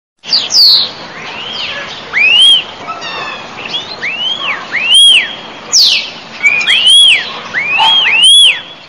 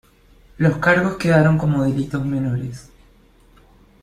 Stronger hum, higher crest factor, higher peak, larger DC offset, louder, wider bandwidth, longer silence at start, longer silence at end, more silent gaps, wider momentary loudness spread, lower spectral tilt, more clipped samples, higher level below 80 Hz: neither; second, 10 dB vs 18 dB; about the same, 0 dBFS vs -2 dBFS; first, 0.4% vs under 0.1%; first, -6 LUFS vs -18 LUFS; first, 17 kHz vs 11.5 kHz; second, 0.25 s vs 0.6 s; second, 0.05 s vs 1.2 s; neither; first, 19 LU vs 11 LU; second, 1.5 dB/octave vs -7.5 dB/octave; neither; second, -56 dBFS vs -46 dBFS